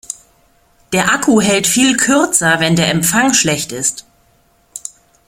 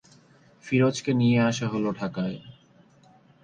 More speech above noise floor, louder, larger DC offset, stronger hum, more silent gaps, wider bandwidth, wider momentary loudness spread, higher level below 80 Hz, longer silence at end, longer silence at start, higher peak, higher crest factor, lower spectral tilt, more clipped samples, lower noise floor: first, 41 dB vs 33 dB; first, -12 LUFS vs -25 LUFS; neither; neither; neither; first, 16.5 kHz vs 9.4 kHz; first, 18 LU vs 10 LU; first, -48 dBFS vs -62 dBFS; second, 0.5 s vs 0.9 s; second, 0.1 s vs 0.65 s; first, 0 dBFS vs -10 dBFS; about the same, 16 dB vs 16 dB; second, -3 dB/octave vs -6.5 dB/octave; neither; about the same, -54 dBFS vs -57 dBFS